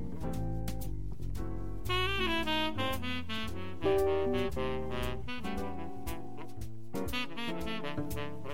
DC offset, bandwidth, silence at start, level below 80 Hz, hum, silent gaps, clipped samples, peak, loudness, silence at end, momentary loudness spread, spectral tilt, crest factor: 1%; 16 kHz; 0 s; -44 dBFS; none; none; under 0.1%; -18 dBFS; -35 LUFS; 0 s; 11 LU; -5.5 dB/octave; 16 dB